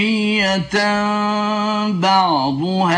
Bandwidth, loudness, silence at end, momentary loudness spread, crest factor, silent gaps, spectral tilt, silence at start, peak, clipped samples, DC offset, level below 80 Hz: 10.5 kHz; -17 LUFS; 0 s; 4 LU; 14 dB; none; -5 dB/octave; 0 s; -4 dBFS; under 0.1%; under 0.1%; -52 dBFS